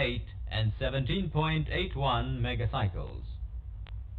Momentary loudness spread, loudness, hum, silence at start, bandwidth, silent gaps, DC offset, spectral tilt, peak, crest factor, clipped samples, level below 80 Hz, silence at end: 13 LU; -32 LUFS; none; 0 s; 4.5 kHz; none; under 0.1%; -8.5 dB/octave; -14 dBFS; 18 dB; under 0.1%; -38 dBFS; 0 s